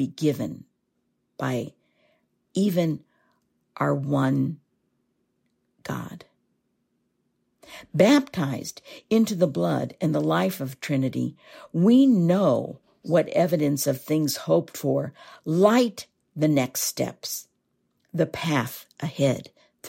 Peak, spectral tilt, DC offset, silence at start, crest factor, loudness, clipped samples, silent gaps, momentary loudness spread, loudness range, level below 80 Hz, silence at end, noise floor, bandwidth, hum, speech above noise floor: -6 dBFS; -6 dB/octave; under 0.1%; 0 s; 20 dB; -24 LUFS; under 0.1%; none; 16 LU; 8 LU; -66 dBFS; 0 s; -74 dBFS; 16.5 kHz; none; 51 dB